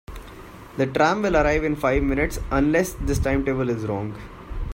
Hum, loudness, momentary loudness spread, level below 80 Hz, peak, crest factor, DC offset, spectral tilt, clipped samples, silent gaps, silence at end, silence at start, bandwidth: none; -22 LUFS; 19 LU; -32 dBFS; -6 dBFS; 18 dB; under 0.1%; -6 dB/octave; under 0.1%; none; 0 s; 0.1 s; 16.5 kHz